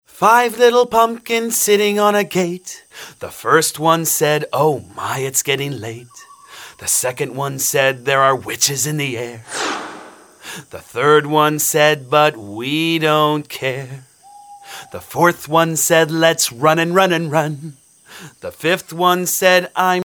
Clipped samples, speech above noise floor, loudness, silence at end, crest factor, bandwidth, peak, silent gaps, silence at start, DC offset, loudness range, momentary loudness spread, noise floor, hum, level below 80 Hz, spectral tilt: under 0.1%; 25 dB; -16 LUFS; 0 s; 18 dB; over 20 kHz; 0 dBFS; none; 0.15 s; under 0.1%; 4 LU; 19 LU; -41 dBFS; none; -62 dBFS; -3 dB/octave